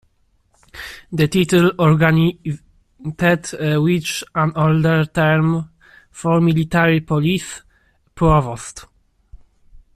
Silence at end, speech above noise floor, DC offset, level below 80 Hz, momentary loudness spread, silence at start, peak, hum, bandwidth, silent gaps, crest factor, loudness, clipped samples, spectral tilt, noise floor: 1.15 s; 44 dB; under 0.1%; -40 dBFS; 18 LU; 0.75 s; -2 dBFS; none; 14 kHz; none; 16 dB; -17 LUFS; under 0.1%; -6.5 dB/octave; -60 dBFS